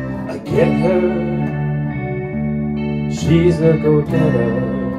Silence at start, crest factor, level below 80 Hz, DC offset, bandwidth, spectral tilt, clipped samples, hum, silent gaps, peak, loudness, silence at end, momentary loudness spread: 0 s; 14 dB; -36 dBFS; under 0.1%; 10.5 kHz; -8 dB/octave; under 0.1%; none; none; -2 dBFS; -17 LUFS; 0 s; 8 LU